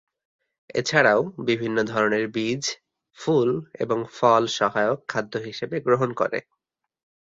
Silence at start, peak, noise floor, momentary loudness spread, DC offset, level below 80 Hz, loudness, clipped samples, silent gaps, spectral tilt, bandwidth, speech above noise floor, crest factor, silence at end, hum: 0.75 s; -2 dBFS; -79 dBFS; 11 LU; under 0.1%; -66 dBFS; -23 LUFS; under 0.1%; none; -4.5 dB/octave; 7.8 kHz; 56 dB; 22 dB; 0.8 s; none